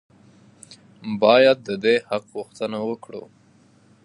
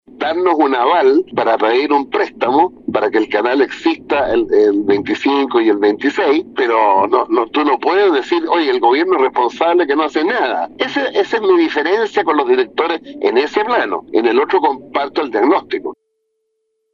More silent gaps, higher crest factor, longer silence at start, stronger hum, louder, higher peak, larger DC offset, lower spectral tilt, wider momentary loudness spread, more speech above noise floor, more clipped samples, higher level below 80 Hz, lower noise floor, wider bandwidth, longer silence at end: neither; first, 20 dB vs 14 dB; first, 0.7 s vs 0.2 s; neither; second, -20 LUFS vs -15 LUFS; about the same, -2 dBFS vs -2 dBFS; neither; about the same, -5 dB/octave vs -5 dB/octave; first, 22 LU vs 6 LU; second, 35 dB vs 55 dB; neither; second, -70 dBFS vs -54 dBFS; second, -55 dBFS vs -69 dBFS; first, 11 kHz vs 7.4 kHz; second, 0.85 s vs 1 s